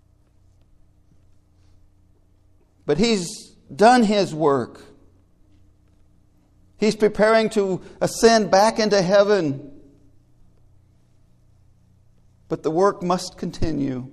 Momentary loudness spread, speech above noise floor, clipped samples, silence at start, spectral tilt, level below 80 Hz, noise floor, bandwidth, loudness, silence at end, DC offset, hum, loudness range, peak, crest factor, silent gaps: 15 LU; 38 dB; under 0.1%; 2.85 s; -5 dB/octave; -46 dBFS; -56 dBFS; 13.5 kHz; -19 LUFS; 0.05 s; under 0.1%; none; 10 LU; 0 dBFS; 22 dB; none